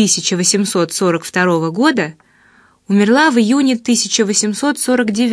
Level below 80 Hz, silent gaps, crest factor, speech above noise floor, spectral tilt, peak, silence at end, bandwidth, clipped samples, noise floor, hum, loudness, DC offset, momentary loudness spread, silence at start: -62 dBFS; none; 14 dB; 36 dB; -3.5 dB/octave; 0 dBFS; 0 s; 11 kHz; under 0.1%; -50 dBFS; none; -14 LUFS; under 0.1%; 5 LU; 0 s